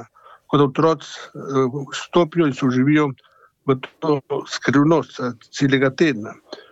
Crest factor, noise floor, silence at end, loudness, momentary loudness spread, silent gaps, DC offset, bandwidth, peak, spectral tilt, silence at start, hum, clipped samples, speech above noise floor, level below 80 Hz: 16 dB; -46 dBFS; 0.1 s; -20 LUFS; 12 LU; none; under 0.1%; 8 kHz; -4 dBFS; -6.5 dB/octave; 0 s; none; under 0.1%; 27 dB; -60 dBFS